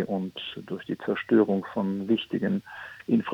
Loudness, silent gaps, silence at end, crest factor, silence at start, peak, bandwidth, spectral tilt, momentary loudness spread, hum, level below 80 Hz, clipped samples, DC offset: -28 LUFS; none; 0 s; 18 dB; 0 s; -10 dBFS; 6.6 kHz; -8 dB/octave; 14 LU; none; -68 dBFS; under 0.1%; under 0.1%